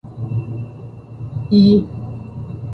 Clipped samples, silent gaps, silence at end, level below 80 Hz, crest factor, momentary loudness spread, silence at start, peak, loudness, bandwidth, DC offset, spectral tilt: under 0.1%; none; 0 s; -42 dBFS; 16 dB; 21 LU; 0.05 s; -2 dBFS; -17 LUFS; 5 kHz; under 0.1%; -10 dB/octave